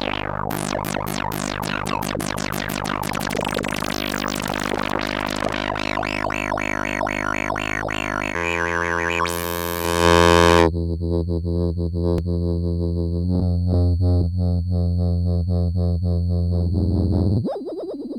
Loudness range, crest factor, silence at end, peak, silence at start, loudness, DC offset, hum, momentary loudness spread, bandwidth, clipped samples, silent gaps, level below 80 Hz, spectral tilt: 6 LU; 20 dB; 0 s; 0 dBFS; 0 s; -22 LUFS; under 0.1%; none; 6 LU; 17 kHz; under 0.1%; none; -34 dBFS; -5.5 dB/octave